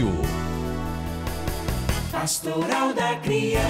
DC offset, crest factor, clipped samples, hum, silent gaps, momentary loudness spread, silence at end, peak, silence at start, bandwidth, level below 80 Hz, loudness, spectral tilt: under 0.1%; 12 dB; under 0.1%; none; none; 7 LU; 0 s; -12 dBFS; 0 s; 16 kHz; -34 dBFS; -26 LUFS; -4.5 dB/octave